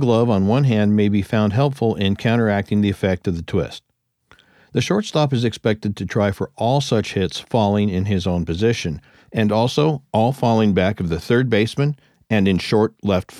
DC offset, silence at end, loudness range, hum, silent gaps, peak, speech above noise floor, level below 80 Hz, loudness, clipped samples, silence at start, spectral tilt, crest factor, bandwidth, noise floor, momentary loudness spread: under 0.1%; 0 s; 3 LU; none; none; -4 dBFS; 38 dB; -46 dBFS; -19 LUFS; under 0.1%; 0 s; -7 dB/octave; 14 dB; 13 kHz; -56 dBFS; 7 LU